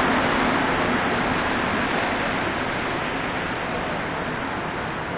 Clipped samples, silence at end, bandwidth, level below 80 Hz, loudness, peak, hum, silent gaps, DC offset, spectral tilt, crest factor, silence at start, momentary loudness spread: under 0.1%; 0 s; 4 kHz; -42 dBFS; -23 LUFS; -10 dBFS; none; none; under 0.1%; -3 dB/octave; 14 dB; 0 s; 6 LU